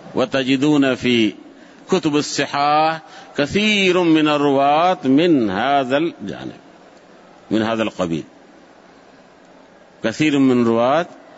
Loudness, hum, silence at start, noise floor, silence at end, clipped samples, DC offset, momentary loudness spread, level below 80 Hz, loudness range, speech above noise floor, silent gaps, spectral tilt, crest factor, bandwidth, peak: -17 LUFS; none; 0.05 s; -47 dBFS; 0.25 s; under 0.1%; under 0.1%; 10 LU; -56 dBFS; 10 LU; 30 dB; none; -5 dB/octave; 14 dB; 8 kHz; -6 dBFS